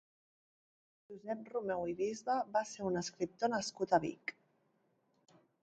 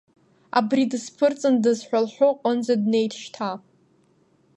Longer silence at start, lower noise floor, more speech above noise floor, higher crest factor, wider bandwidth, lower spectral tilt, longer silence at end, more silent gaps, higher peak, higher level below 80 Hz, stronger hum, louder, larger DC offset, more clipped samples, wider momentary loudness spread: first, 1.1 s vs 0.55 s; first, -77 dBFS vs -61 dBFS; about the same, 40 dB vs 40 dB; about the same, 22 dB vs 18 dB; second, 9 kHz vs 11 kHz; about the same, -4.5 dB/octave vs -5 dB/octave; first, 1.35 s vs 1 s; neither; second, -16 dBFS vs -6 dBFS; about the same, -74 dBFS vs -78 dBFS; neither; second, -38 LUFS vs -23 LUFS; neither; neither; about the same, 12 LU vs 10 LU